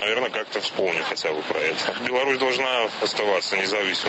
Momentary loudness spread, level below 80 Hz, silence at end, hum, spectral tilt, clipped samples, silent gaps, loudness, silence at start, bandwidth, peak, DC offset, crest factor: 4 LU; -72 dBFS; 0 s; none; -2.5 dB/octave; under 0.1%; none; -23 LUFS; 0 s; 8.6 kHz; -10 dBFS; under 0.1%; 14 dB